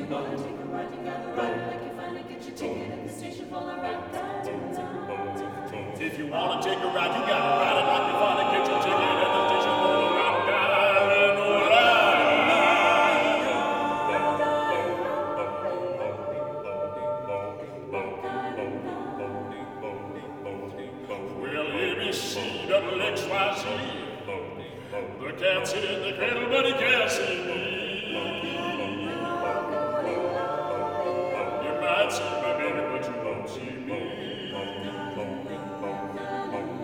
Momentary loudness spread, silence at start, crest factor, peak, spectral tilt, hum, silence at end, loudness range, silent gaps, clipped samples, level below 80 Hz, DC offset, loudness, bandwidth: 15 LU; 0 s; 20 dB; -8 dBFS; -4 dB/octave; none; 0 s; 13 LU; none; under 0.1%; -64 dBFS; under 0.1%; -26 LUFS; 18.5 kHz